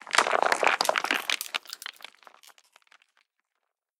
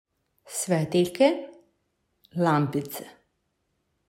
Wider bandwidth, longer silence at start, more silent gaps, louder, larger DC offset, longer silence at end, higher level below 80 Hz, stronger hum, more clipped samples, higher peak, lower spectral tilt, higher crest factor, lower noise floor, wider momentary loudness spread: first, 18 kHz vs 16 kHz; second, 0.05 s vs 0.45 s; neither; about the same, -25 LUFS vs -25 LUFS; neither; first, 2.25 s vs 1 s; second, -84 dBFS vs -70 dBFS; neither; neither; first, -4 dBFS vs -8 dBFS; second, 0.5 dB/octave vs -5.5 dB/octave; first, 26 dB vs 20 dB; first, -83 dBFS vs -75 dBFS; first, 18 LU vs 15 LU